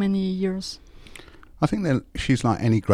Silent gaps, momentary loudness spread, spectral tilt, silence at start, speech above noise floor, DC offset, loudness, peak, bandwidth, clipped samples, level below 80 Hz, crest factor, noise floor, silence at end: none; 23 LU; -6.5 dB/octave; 0 s; 22 dB; under 0.1%; -24 LUFS; -6 dBFS; 12 kHz; under 0.1%; -44 dBFS; 18 dB; -45 dBFS; 0 s